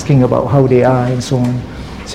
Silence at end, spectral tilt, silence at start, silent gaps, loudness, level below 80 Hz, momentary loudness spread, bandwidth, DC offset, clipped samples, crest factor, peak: 0 s; -7.5 dB/octave; 0 s; none; -13 LUFS; -36 dBFS; 14 LU; 11 kHz; 0.8%; under 0.1%; 12 dB; 0 dBFS